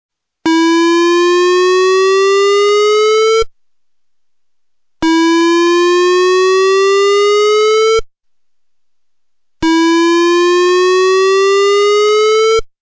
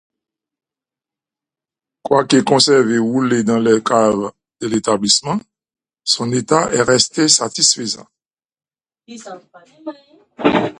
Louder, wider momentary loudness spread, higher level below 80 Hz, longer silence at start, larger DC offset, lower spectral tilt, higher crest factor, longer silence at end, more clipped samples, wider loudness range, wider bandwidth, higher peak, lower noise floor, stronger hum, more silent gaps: first, -10 LUFS vs -15 LUFS; second, 3 LU vs 21 LU; first, -44 dBFS vs -56 dBFS; second, 0.45 s vs 2.05 s; neither; about the same, -2.5 dB/octave vs -3 dB/octave; second, 4 dB vs 18 dB; about the same, 0.15 s vs 0.05 s; neither; about the same, 3 LU vs 3 LU; second, 8 kHz vs 11.5 kHz; second, -8 dBFS vs 0 dBFS; second, -78 dBFS vs -88 dBFS; neither; neither